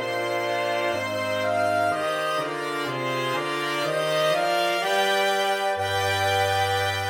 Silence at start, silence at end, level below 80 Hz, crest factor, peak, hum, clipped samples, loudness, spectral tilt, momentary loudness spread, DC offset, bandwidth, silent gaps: 0 s; 0 s; -66 dBFS; 14 dB; -10 dBFS; none; under 0.1%; -24 LUFS; -3.5 dB/octave; 4 LU; under 0.1%; 17.5 kHz; none